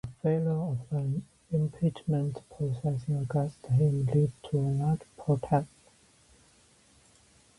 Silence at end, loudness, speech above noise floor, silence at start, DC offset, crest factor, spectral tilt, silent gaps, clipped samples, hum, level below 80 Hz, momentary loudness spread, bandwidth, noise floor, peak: 1.95 s; -30 LUFS; 33 dB; 0.05 s; under 0.1%; 18 dB; -9.5 dB/octave; none; under 0.1%; none; -58 dBFS; 7 LU; 11.5 kHz; -62 dBFS; -12 dBFS